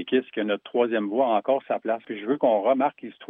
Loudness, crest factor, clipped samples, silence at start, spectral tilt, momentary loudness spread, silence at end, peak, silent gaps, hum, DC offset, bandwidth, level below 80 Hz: -25 LUFS; 16 dB; under 0.1%; 0 s; -9 dB/octave; 6 LU; 0.05 s; -8 dBFS; none; none; under 0.1%; 3.9 kHz; -86 dBFS